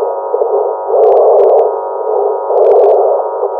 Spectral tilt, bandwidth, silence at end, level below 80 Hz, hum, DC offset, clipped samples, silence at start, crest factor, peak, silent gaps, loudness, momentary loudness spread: -7 dB/octave; 3.6 kHz; 0 s; -66 dBFS; none; under 0.1%; under 0.1%; 0 s; 10 dB; 0 dBFS; none; -10 LUFS; 8 LU